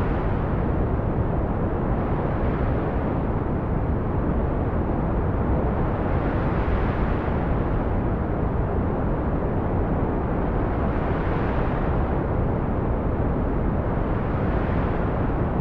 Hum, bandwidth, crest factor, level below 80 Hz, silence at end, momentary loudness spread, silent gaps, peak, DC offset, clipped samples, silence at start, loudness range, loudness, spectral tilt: none; 4.9 kHz; 12 dB; -28 dBFS; 0 s; 1 LU; none; -10 dBFS; 0.8%; under 0.1%; 0 s; 1 LU; -25 LUFS; -11 dB/octave